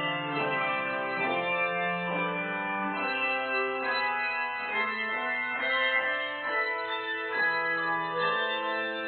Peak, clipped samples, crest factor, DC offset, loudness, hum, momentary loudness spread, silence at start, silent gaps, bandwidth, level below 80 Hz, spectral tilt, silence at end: -14 dBFS; under 0.1%; 16 dB; under 0.1%; -29 LUFS; none; 4 LU; 0 s; none; 4.7 kHz; -76 dBFS; -1 dB/octave; 0 s